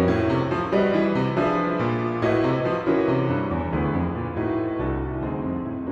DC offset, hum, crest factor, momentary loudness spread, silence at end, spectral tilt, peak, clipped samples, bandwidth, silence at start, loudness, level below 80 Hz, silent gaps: under 0.1%; none; 14 dB; 6 LU; 0 s; -8.5 dB/octave; -10 dBFS; under 0.1%; 7.6 kHz; 0 s; -24 LUFS; -40 dBFS; none